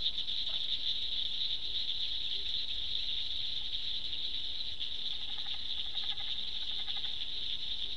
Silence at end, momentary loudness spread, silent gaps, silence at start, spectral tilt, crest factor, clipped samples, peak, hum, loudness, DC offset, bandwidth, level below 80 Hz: 0 s; 4 LU; none; 0 s; -1.5 dB/octave; 20 dB; under 0.1%; -18 dBFS; none; -34 LUFS; 2%; 11 kHz; -58 dBFS